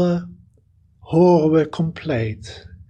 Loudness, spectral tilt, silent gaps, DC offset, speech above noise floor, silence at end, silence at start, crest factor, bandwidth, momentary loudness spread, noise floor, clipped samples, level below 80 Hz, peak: -19 LUFS; -8.5 dB/octave; none; under 0.1%; 38 dB; 0.3 s; 0 s; 16 dB; 8.6 kHz; 21 LU; -56 dBFS; under 0.1%; -50 dBFS; -4 dBFS